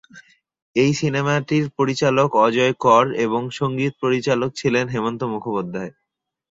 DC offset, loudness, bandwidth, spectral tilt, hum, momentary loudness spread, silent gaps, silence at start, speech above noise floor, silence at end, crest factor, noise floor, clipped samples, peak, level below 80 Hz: under 0.1%; -20 LUFS; 7.8 kHz; -6 dB/octave; none; 10 LU; 0.62-0.74 s; 0.15 s; 60 dB; 0.6 s; 18 dB; -79 dBFS; under 0.1%; -2 dBFS; -58 dBFS